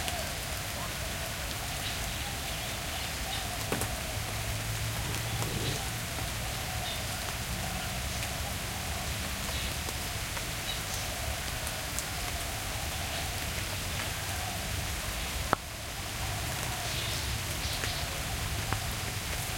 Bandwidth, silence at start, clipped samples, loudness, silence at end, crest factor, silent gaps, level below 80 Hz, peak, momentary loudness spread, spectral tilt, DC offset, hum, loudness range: 17 kHz; 0 s; under 0.1%; -33 LUFS; 0 s; 28 dB; none; -42 dBFS; -6 dBFS; 2 LU; -2.5 dB/octave; under 0.1%; none; 1 LU